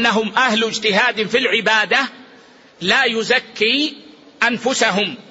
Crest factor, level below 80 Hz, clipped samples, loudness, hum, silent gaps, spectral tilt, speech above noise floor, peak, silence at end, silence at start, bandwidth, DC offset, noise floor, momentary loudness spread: 16 dB; -62 dBFS; under 0.1%; -16 LUFS; none; none; -2.5 dB/octave; 29 dB; -2 dBFS; 0.1 s; 0 s; 8 kHz; under 0.1%; -46 dBFS; 4 LU